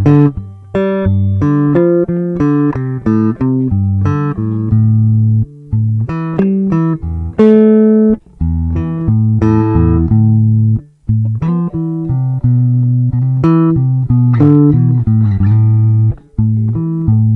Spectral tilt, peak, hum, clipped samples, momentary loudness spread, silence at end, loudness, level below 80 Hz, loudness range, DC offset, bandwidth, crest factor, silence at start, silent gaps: -11.5 dB/octave; 0 dBFS; none; under 0.1%; 8 LU; 0 s; -12 LUFS; -32 dBFS; 3 LU; under 0.1%; 3.7 kHz; 10 dB; 0 s; none